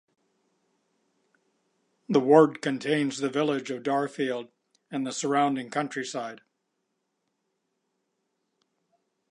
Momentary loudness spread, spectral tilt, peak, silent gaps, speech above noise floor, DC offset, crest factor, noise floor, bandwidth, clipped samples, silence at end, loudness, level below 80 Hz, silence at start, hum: 14 LU; -5 dB/octave; -4 dBFS; none; 53 dB; under 0.1%; 24 dB; -79 dBFS; 11 kHz; under 0.1%; 2.95 s; -26 LUFS; -82 dBFS; 2.1 s; none